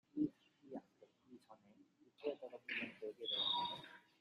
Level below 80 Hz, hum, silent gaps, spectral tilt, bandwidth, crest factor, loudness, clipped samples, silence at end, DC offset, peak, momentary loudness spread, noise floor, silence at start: -88 dBFS; none; none; -5 dB/octave; 12 kHz; 20 dB; -43 LUFS; under 0.1%; 0.2 s; under 0.1%; -28 dBFS; 22 LU; -70 dBFS; 0.15 s